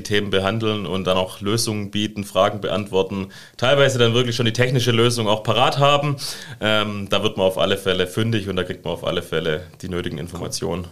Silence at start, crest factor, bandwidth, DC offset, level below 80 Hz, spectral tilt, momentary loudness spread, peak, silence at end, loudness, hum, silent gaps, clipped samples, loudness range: 0 s; 18 dB; 15.5 kHz; 1%; -48 dBFS; -4.5 dB/octave; 10 LU; -2 dBFS; 0 s; -20 LUFS; none; none; under 0.1%; 4 LU